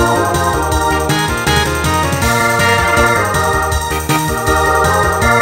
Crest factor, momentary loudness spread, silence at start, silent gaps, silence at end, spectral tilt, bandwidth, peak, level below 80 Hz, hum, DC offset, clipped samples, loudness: 12 dB; 4 LU; 0 s; none; 0 s; -4 dB/octave; 16.5 kHz; 0 dBFS; -24 dBFS; none; under 0.1%; under 0.1%; -13 LUFS